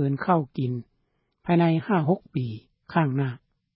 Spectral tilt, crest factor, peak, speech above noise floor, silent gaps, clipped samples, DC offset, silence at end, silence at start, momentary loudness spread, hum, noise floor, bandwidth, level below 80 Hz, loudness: -12.5 dB/octave; 18 dB; -8 dBFS; 49 dB; none; under 0.1%; under 0.1%; 0.4 s; 0 s; 14 LU; none; -73 dBFS; 5.4 kHz; -64 dBFS; -25 LUFS